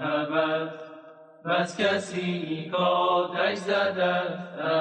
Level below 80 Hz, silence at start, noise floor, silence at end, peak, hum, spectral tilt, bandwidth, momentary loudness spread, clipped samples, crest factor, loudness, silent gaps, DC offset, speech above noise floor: -74 dBFS; 0 s; -48 dBFS; 0 s; -12 dBFS; none; -5 dB/octave; 10 kHz; 9 LU; under 0.1%; 14 dB; -26 LUFS; none; under 0.1%; 22 dB